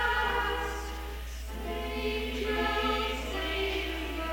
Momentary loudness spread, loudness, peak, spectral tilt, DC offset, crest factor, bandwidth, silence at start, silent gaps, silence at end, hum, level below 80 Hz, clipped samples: 11 LU; -32 LUFS; -16 dBFS; -4.5 dB/octave; under 0.1%; 16 dB; 19 kHz; 0 s; none; 0 s; none; -38 dBFS; under 0.1%